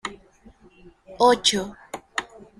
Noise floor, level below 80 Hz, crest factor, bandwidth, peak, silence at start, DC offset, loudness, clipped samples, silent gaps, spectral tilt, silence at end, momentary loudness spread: -52 dBFS; -56 dBFS; 20 dB; 15 kHz; -4 dBFS; 0.05 s; under 0.1%; -22 LUFS; under 0.1%; none; -2 dB/octave; 0.35 s; 19 LU